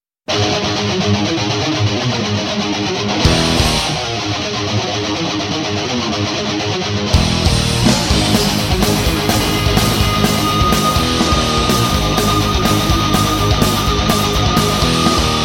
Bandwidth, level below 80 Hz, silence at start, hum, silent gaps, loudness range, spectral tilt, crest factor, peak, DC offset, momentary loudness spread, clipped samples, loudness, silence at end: 16.5 kHz; -24 dBFS; 0.3 s; none; none; 3 LU; -4 dB/octave; 14 dB; 0 dBFS; under 0.1%; 5 LU; under 0.1%; -15 LUFS; 0 s